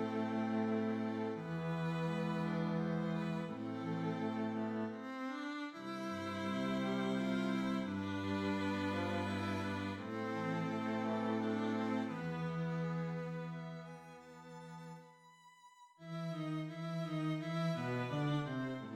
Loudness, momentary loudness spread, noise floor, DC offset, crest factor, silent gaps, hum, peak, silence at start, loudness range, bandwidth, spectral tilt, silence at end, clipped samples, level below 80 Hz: -39 LUFS; 8 LU; -63 dBFS; under 0.1%; 14 dB; none; none; -26 dBFS; 0 s; 7 LU; 12 kHz; -7 dB/octave; 0 s; under 0.1%; -76 dBFS